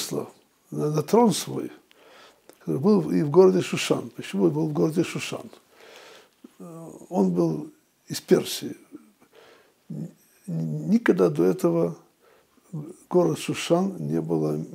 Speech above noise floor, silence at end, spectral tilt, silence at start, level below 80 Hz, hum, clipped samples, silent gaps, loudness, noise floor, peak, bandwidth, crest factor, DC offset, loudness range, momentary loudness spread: 36 dB; 0 s; -6 dB/octave; 0 s; -72 dBFS; none; under 0.1%; none; -24 LUFS; -60 dBFS; -4 dBFS; 16 kHz; 20 dB; under 0.1%; 6 LU; 19 LU